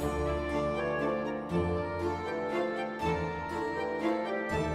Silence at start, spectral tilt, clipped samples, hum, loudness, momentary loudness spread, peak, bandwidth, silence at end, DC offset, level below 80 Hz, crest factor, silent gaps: 0 s; -6.5 dB/octave; under 0.1%; none; -32 LUFS; 3 LU; -18 dBFS; 15.5 kHz; 0 s; under 0.1%; -46 dBFS; 14 dB; none